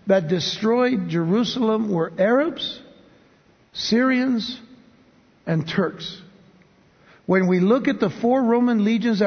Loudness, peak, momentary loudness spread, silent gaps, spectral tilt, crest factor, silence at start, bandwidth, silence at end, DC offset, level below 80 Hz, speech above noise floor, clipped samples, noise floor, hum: -21 LUFS; -6 dBFS; 15 LU; none; -6.5 dB/octave; 16 dB; 0.05 s; 6.6 kHz; 0 s; under 0.1%; -62 dBFS; 36 dB; under 0.1%; -56 dBFS; none